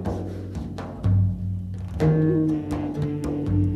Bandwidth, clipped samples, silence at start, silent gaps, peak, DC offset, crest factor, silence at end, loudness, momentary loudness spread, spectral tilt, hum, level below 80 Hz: 9.4 kHz; under 0.1%; 0 s; none; -10 dBFS; under 0.1%; 14 dB; 0 s; -25 LUFS; 12 LU; -9.5 dB/octave; none; -38 dBFS